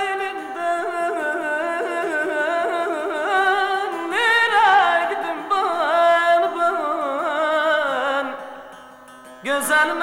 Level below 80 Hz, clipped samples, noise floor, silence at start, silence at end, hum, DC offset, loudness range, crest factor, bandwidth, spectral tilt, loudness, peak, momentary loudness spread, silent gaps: -68 dBFS; under 0.1%; -42 dBFS; 0 s; 0 s; none; under 0.1%; 5 LU; 16 dB; 17 kHz; -1.5 dB/octave; -20 LUFS; -4 dBFS; 9 LU; none